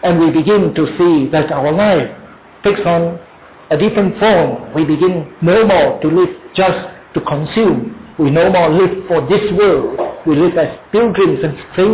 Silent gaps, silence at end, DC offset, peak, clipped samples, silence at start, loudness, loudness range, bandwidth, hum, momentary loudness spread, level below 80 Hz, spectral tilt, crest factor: none; 0 s; under 0.1%; -2 dBFS; under 0.1%; 0.05 s; -13 LUFS; 2 LU; 4 kHz; none; 8 LU; -42 dBFS; -11 dB/octave; 10 dB